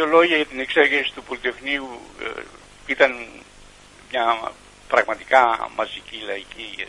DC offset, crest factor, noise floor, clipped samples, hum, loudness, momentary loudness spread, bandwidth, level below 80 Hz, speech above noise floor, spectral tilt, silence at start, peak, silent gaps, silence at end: under 0.1%; 22 dB; -47 dBFS; under 0.1%; 50 Hz at -55 dBFS; -21 LUFS; 17 LU; 11.5 kHz; -54 dBFS; 25 dB; -3 dB/octave; 0 s; 0 dBFS; none; 0 s